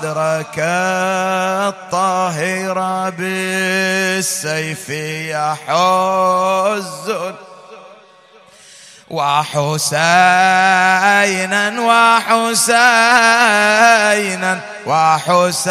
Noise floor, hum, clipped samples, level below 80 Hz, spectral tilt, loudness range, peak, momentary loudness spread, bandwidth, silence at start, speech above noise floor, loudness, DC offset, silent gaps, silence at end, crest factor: -45 dBFS; none; under 0.1%; -66 dBFS; -3 dB/octave; 8 LU; 0 dBFS; 10 LU; 15.5 kHz; 0 s; 31 dB; -14 LUFS; under 0.1%; none; 0 s; 14 dB